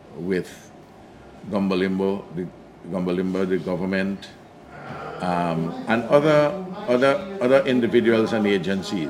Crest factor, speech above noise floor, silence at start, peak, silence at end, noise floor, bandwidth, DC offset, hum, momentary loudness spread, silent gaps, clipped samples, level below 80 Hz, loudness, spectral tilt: 20 dB; 24 dB; 0.05 s; -2 dBFS; 0 s; -45 dBFS; 15 kHz; under 0.1%; none; 17 LU; none; under 0.1%; -58 dBFS; -22 LUFS; -7 dB/octave